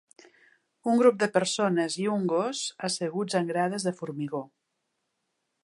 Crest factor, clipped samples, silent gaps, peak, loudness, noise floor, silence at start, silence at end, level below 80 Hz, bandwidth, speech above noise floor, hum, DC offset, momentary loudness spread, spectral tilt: 20 dB; under 0.1%; none; -8 dBFS; -27 LUFS; -80 dBFS; 0.85 s; 1.15 s; -80 dBFS; 11.5 kHz; 53 dB; none; under 0.1%; 12 LU; -4.5 dB/octave